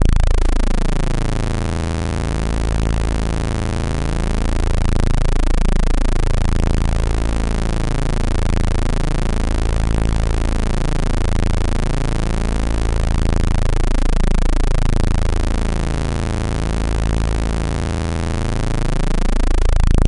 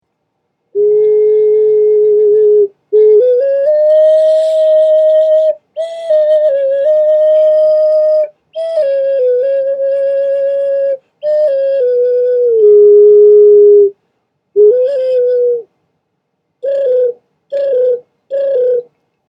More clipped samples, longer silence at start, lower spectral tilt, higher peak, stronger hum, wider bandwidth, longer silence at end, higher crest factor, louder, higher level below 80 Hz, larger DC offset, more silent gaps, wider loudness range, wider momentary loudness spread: neither; second, 0 s vs 0.75 s; about the same, -6 dB/octave vs -5.5 dB/octave; second, -4 dBFS vs 0 dBFS; neither; first, 11 kHz vs 5.2 kHz; second, 0 s vs 0.55 s; about the same, 10 dB vs 10 dB; second, -21 LUFS vs -10 LUFS; first, -16 dBFS vs -72 dBFS; neither; neither; second, 1 LU vs 7 LU; second, 2 LU vs 12 LU